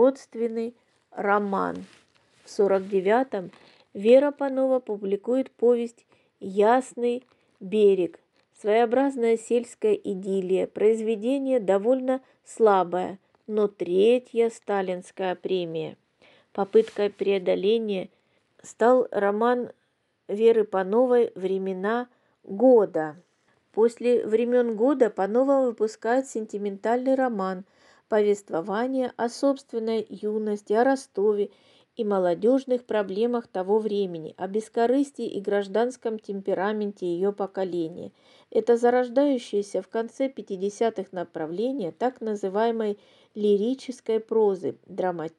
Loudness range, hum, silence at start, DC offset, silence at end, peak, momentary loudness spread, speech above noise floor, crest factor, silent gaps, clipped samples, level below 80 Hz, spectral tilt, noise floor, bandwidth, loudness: 4 LU; none; 0 s; under 0.1%; 0.1 s; -6 dBFS; 11 LU; 48 dB; 18 dB; none; under 0.1%; -82 dBFS; -6 dB/octave; -72 dBFS; 11 kHz; -25 LUFS